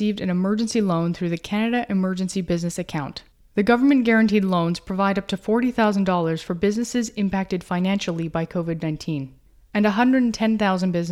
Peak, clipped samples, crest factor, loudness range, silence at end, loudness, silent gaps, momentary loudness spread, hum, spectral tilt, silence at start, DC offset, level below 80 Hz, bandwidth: -4 dBFS; under 0.1%; 18 dB; 4 LU; 0 s; -22 LUFS; none; 10 LU; none; -6 dB/octave; 0 s; under 0.1%; -50 dBFS; 13 kHz